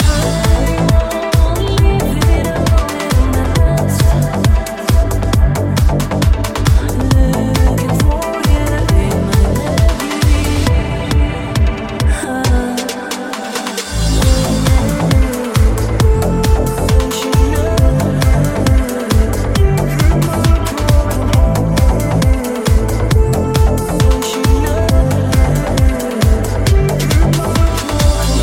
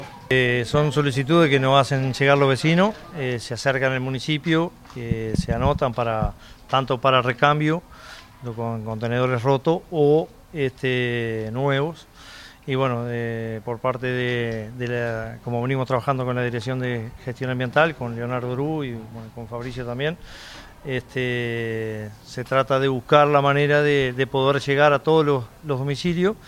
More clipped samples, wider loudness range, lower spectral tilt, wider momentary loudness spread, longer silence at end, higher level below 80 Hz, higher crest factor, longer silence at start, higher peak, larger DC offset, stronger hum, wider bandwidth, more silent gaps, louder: neither; second, 2 LU vs 7 LU; about the same, -6 dB/octave vs -6.5 dB/octave; second, 3 LU vs 14 LU; about the same, 0 s vs 0 s; first, -16 dBFS vs -44 dBFS; second, 12 dB vs 22 dB; about the same, 0 s vs 0 s; about the same, 0 dBFS vs 0 dBFS; neither; neither; about the same, 16.5 kHz vs 15.5 kHz; neither; first, -14 LUFS vs -22 LUFS